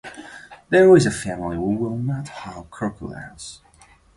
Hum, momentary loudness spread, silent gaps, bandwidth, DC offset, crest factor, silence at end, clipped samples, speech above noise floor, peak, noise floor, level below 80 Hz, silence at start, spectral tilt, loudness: none; 24 LU; none; 11.5 kHz; under 0.1%; 18 dB; 0.6 s; under 0.1%; 33 dB; -2 dBFS; -53 dBFS; -48 dBFS; 0.05 s; -6 dB/octave; -19 LUFS